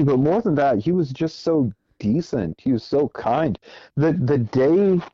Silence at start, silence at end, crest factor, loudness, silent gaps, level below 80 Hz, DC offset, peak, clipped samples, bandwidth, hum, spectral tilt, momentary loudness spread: 0 s; 0.05 s; 14 dB; -21 LUFS; none; -50 dBFS; under 0.1%; -6 dBFS; under 0.1%; 7.4 kHz; none; -8.5 dB/octave; 8 LU